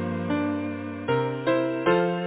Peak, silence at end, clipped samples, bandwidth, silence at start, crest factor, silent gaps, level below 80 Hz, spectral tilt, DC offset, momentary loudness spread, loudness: -10 dBFS; 0 s; under 0.1%; 4 kHz; 0 s; 16 dB; none; -54 dBFS; -11 dB/octave; under 0.1%; 8 LU; -26 LUFS